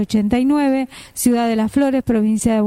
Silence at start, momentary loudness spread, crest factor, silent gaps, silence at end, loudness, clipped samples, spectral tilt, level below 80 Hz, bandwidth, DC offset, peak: 0 s; 4 LU; 14 dB; none; 0 s; -17 LUFS; under 0.1%; -5.5 dB/octave; -42 dBFS; 15.5 kHz; under 0.1%; -4 dBFS